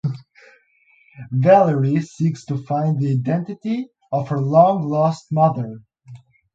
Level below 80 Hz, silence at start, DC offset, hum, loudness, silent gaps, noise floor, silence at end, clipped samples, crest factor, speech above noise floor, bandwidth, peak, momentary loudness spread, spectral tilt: -62 dBFS; 0.05 s; under 0.1%; none; -19 LUFS; none; -57 dBFS; 0.4 s; under 0.1%; 20 dB; 39 dB; 7.8 kHz; 0 dBFS; 13 LU; -9 dB/octave